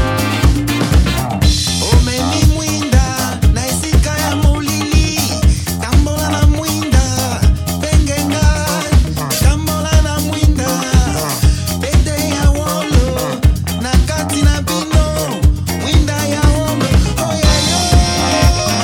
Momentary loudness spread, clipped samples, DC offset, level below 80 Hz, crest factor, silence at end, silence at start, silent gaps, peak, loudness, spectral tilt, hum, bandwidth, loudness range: 4 LU; under 0.1%; under 0.1%; -16 dBFS; 12 dB; 0 s; 0 s; none; 0 dBFS; -14 LUFS; -4.5 dB/octave; none; 18.5 kHz; 1 LU